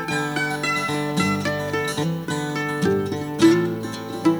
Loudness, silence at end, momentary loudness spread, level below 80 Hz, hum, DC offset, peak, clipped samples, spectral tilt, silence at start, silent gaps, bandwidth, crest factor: -22 LUFS; 0 s; 9 LU; -56 dBFS; none; under 0.1%; -4 dBFS; under 0.1%; -5 dB/octave; 0 s; none; over 20 kHz; 18 dB